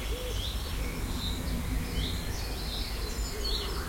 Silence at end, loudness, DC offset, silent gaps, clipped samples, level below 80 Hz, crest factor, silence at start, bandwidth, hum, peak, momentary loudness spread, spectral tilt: 0 s; -34 LUFS; under 0.1%; none; under 0.1%; -34 dBFS; 14 dB; 0 s; 16.5 kHz; none; -18 dBFS; 3 LU; -4 dB/octave